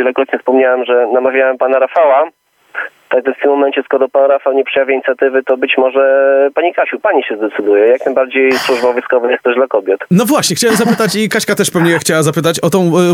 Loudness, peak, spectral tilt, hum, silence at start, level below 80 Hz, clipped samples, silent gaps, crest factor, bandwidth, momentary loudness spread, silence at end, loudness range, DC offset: -12 LUFS; 0 dBFS; -4.5 dB/octave; none; 0 s; -60 dBFS; under 0.1%; none; 12 dB; 17 kHz; 4 LU; 0 s; 1 LU; under 0.1%